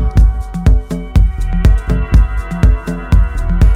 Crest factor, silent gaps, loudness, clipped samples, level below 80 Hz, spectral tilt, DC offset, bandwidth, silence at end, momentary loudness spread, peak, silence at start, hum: 10 dB; none; -15 LUFS; under 0.1%; -12 dBFS; -8 dB/octave; under 0.1%; 8.6 kHz; 0 s; 4 LU; 0 dBFS; 0 s; none